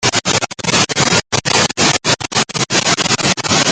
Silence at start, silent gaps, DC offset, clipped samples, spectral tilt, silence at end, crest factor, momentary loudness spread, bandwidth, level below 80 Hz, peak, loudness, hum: 0 s; none; under 0.1%; under 0.1%; -2 dB/octave; 0 s; 14 dB; 3 LU; 10.5 kHz; -46 dBFS; 0 dBFS; -13 LUFS; none